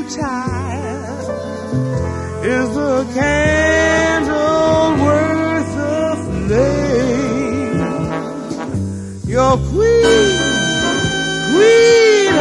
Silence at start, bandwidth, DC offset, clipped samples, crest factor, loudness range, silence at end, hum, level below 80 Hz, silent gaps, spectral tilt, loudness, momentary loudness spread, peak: 0 s; 11.5 kHz; under 0.1%; under 0.1%; 14 dB; 5 LU; 0 s; none; -34 dBFS; none; -5 dB/octave; -15 LUFS; 12 LU; 0 dBFS